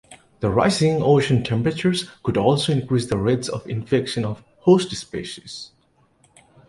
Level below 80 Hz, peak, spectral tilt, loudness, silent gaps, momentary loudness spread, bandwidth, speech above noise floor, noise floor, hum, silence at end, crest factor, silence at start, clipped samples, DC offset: -48 dBFS; -4 dBFS; -6 dB/octave; -21 LUFS; none; 14 LU; 11.5 kHz; 41 dB; -61 dBFS; none; 1.05 s; 18 dB; 0.1 s; under 0.1%; under 0.1%